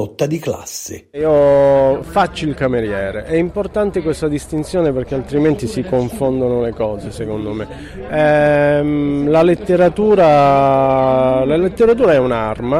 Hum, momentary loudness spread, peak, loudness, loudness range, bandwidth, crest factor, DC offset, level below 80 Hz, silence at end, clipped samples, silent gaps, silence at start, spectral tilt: none; 12 LU; -2 dBFS; -15 LUFS; 6 LU; 16 kHz; 12 dB; under 0.1%; -38 dBFS; 0 s; under 0.1%; none; 0 s; -6.5 dB/octave